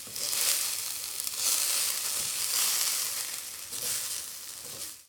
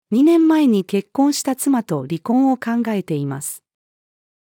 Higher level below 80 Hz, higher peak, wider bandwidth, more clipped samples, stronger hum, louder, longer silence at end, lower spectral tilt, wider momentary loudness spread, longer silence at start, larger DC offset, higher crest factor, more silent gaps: first, -70 dBFS vs -76 dBFS; about the same, -6 dBFS vs -6 dBFS; first, over 20 kHz vs 18 kHz; neither; neither; second, -28 LUFS vs -18 LUFS; second, 0.05 s vs 0.9 s; second, 2.5 dB/octave vs -5.5 dB/octave; about the same, 12 LU vs 11 LU; about the same, 0 s vs 0.1 s; neither; first, 26 dB vs 12 dB; neither